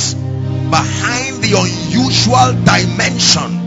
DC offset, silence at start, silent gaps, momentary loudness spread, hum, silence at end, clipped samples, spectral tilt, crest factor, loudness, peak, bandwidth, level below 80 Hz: under 0.1%; 0 s; none; 7 LU; none; 0 s; 0.2%; -4 dB/octave; 14 dB; -12 LUFS; 0 dBFS; 8.6 kHz; -38 dBFS